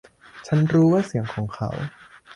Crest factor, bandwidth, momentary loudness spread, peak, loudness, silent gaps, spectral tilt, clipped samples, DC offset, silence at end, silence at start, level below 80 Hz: 14 dB; 10.5 kHz; 16 LU; -8 dBFS; -22 LUFS; none; -8 dB/octave; under 0.1%; under 0.1%; 0 s; 0.35 s; -54 dBFS